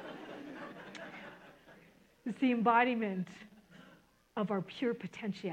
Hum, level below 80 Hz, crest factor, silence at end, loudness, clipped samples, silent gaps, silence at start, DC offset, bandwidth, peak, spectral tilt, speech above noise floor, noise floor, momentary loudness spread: none; -78 dBFS; 22 dB; 0 s; -34 LUFS; under 0.1%; none; 0 s; under 0.1%; 9.4 kHz; -14 dBFS; -7 dB/octave; 30 dB; -63 dBFS; 22 LU